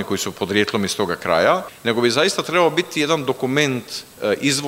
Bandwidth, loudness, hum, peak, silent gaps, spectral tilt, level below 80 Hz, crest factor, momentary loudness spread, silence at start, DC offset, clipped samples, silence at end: 16 kHz; -19 LUFS; none; -2 dBFS; none; -3.5 dB/octave; -58 dBFS; 18 dB; 6 LU; 0 s; under 0.1%; under 0.1%; 0 s